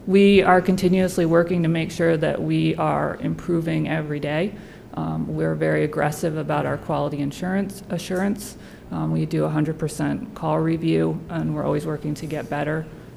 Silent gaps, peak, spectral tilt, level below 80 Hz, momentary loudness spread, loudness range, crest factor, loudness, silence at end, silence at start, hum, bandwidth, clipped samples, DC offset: none; -4 dBFS; -7 dB/octave; -48 dBFS; 9 LU; 5 LU; 18 dB; -22 LUFS; 0 s; 0 s; none; 14.5 kHz; under 0.1%; under 0.1%